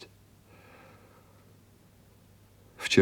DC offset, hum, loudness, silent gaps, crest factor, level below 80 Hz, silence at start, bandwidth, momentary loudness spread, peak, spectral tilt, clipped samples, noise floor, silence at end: under 0.1%; none; -29 LUFS; none; 28 dB; -68 dBFS; 0 s; over 20 kHz; 17 LU; -6 dBFS; -4.5 dB/octave; under 0.1%; -59 dBFS; 0 s